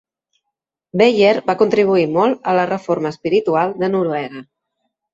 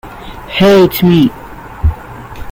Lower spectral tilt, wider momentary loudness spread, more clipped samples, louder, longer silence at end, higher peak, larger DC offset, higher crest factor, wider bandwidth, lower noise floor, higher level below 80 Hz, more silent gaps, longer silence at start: about the same, -6.5 dB/octave vs -7 dB/octave; second, 9 LU vs 22 LU; neither; second, -16 LUFS vs -10 LUFS; first, 0.7 s vs 0 s; about the same, -2 dBFS vs 0 dBFS; neither; about the same, 16 dB vs 12 dB; second, 7.8 kHz vs 16.5 kHz; first, -80 dBFS vs -28 dBFS; second, -62 dBFS vs -26 dBFS; neither; first, 0.95 s vs 0.05 s